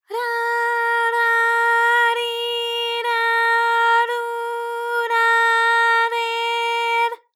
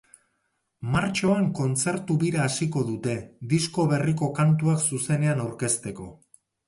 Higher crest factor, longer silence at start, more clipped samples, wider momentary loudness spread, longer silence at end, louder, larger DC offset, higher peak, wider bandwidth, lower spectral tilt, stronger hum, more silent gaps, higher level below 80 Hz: about the same, 12 dB vs 16 dB; second, 0.1 s vs 0.8 s; neither; about the same, 8 LU vs 8 LU; second, 0.2 s vs 0.55 s; first, -18 LUFS vs -25 LUFS; neither; about the same, -8 dBFS vs -10 dBFS; first, 16.5 kHz vs 11.5 kHz; second, 4.5 dB/octave vs -5.5 dB/octave; neither; neither; second, under -90 dBFS vs -56 dBFS